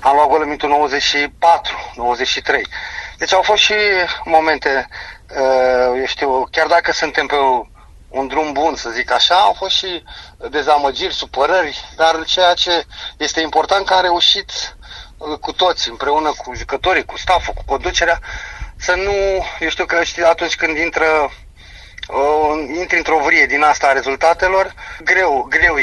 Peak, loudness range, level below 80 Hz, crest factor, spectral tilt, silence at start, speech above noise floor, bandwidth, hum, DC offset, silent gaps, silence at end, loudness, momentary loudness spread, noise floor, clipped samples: 0 dBFS; 3 LU; -38 dBFS; 16 dB; -2 dB/octave; 0 s; 23 dB; 11.5 kHz; none; under 0.1%; none; 0 s; -15 LUFS; 12 LU; -39 dBFS; under 0.1%